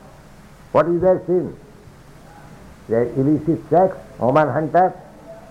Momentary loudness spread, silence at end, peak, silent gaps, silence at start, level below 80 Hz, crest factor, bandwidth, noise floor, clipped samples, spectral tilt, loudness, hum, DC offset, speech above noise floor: 6 LU; 0.1 s; -4 dBFS; none; 0.75 s; -48 dBFS; 16 dB; 11.5 kHz; -43 dBFS; under 0.1%; -9 dB/octave; -18 LUFS; none; under 0.1%; 26 dB